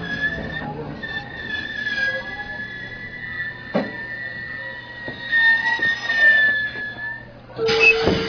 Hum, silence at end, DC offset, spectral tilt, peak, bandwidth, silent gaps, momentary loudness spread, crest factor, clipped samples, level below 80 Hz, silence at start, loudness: none; 0 s; under 0.1%; -4.5 dB/octave; -4 dBFS; 5.4 kHz; none; 17 LU; 18 dB; under 0.1%; -48 dBFS; 0 s; -20 LUFS